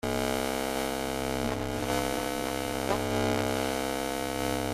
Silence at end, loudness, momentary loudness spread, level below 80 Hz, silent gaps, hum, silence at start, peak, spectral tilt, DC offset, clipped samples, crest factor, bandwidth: 0 s; -30 LUFS; 3 LU; -48 dBFS; none; none; 0.05 s; -12 dBFS; -4 dB/octave; under 0.1%; under 0.1%; 18 dB; 16 kHz